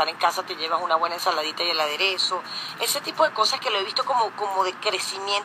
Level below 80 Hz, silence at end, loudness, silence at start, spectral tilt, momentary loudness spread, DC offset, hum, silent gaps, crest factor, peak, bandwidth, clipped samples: -82 dBFS; 0 s; -23 LUFS; 0 s; -0.5 dB/octave; 5 LU; under 0.1%; none; none; 18 dB; -6 dBFS; 15.5 kHz; under 0.1%